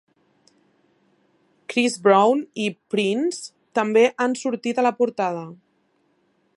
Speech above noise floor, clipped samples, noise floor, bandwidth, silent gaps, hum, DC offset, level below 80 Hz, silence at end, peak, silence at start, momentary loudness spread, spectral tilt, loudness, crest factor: 45 dB; under 0.1%; -66 dBFS; 11.5 kHz; none; none; under 0.1%; -80 dBFS; 1.05 s; -4 dBFS; 1.7 s; 11 LU; -4.5 dB/octave; -21 LUFS; 20 dB